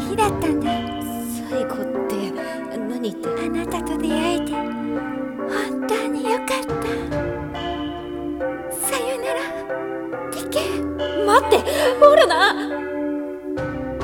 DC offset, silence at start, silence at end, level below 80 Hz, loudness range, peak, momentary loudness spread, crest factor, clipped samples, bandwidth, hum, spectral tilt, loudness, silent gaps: under 0.1%; 0 s; 0 s; -44 dBFS; 8 LU; 0 dBFS; 12 LU; 20 dB; under 0.1%; 18 kHz; none; -4 dB/octave; -22 LUFS; none